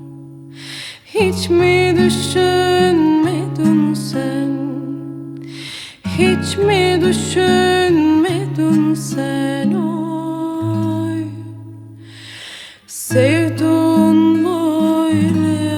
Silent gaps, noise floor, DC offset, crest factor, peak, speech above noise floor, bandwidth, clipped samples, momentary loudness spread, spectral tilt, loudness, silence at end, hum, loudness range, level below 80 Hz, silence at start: none; -36 dBFS; under 0.1%; 16 dB; 0 dBFS; 22 dB; 17.5 kHz; under 0.1%; 18 LU; -5.5 dB/octave; -15 LUFS; 0 s; none; 6 LU; -58 dBFS; 0 s